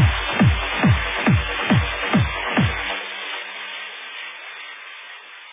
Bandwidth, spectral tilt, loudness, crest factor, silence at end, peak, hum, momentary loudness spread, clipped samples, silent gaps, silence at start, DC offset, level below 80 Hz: 3.8 kHz; -10 dB/octave; -21 LUFS; 16 dB; 0 s; -4 dBFS; none; 16 LU; under 0.1%; none; 0 s; under 0.1%; -32 dBFS